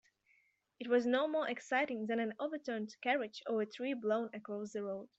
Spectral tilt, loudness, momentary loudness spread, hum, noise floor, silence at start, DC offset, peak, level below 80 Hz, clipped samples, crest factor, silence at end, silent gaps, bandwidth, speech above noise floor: -5 dB/octave; -37 LUFS; 9 LU; none; -75 dBFS; 0.8 s; under 0.1%; -20 dBFS; -86 dBFS; under 0.1%; 18 dB; 0.1 s; none; 8.2 kHz; 38 dB